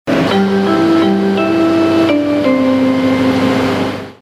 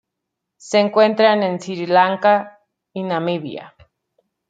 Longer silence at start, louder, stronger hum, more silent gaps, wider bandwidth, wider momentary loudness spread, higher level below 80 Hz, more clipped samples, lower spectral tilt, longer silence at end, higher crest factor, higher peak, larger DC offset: second, 0.05 s vs 0.65 s; first, -12 LUFS vs -17 LUFS; neither; neither; first, 14 kHz vs 9.2 kHz; second, 2 LU vs 18 LU; first, -48 dBFS vs -68 dBFS; neither; about the same, -6.5 dB/octave vs -5.5 dB/octave; second, 0.1 s vs 0.8 s; second, 10 dB vs 18 dB; about the same, -2 dBFS vs -2 dBFS; neither